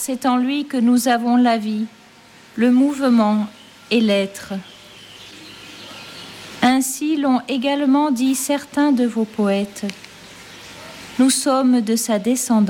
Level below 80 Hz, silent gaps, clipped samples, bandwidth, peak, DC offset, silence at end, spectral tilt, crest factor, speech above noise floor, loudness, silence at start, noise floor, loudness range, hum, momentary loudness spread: -62 dBFS; none; under 0.1%; 16.5 kHz; -6 dBFS; under 0.1%; 0 s; -4 dB/octave; 12 dB; 29 dB; -18 LUFS; 0 s; -46 dBFS; 5 LU; none; 21 LU